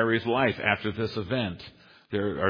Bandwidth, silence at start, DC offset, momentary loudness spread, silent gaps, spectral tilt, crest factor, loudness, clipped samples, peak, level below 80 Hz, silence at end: 5.2 kHz; 0 s; under 0.1%; 11 LU; none; -8 dB/octave; 20 dB; -28 LUFS; under 0.1%; -6 dBFS; -58 dBFS; 0 s